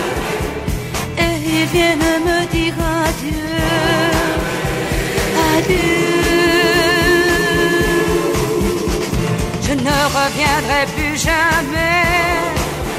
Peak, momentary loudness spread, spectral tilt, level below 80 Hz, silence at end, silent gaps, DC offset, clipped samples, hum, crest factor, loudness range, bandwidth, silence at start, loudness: 0 dBFS; 7 LU; -4.5 dB/octave; -28 dBFS; 0 s; none; under 0.1%; under 0.1%; none; 14 dB; 3 LU; 16 kHz; 0 s; -15 LUFS